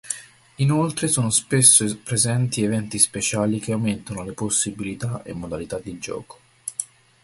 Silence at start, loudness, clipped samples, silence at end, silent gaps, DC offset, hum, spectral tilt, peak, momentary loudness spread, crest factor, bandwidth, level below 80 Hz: 0.05 s; -20 LUFS; under 0.1%; 0.4 s; none; under 0.1%; none; -3.5 dB/octave; 0 dBFS; 17 LU; 22 dB; 12 kHz; -52 dBFS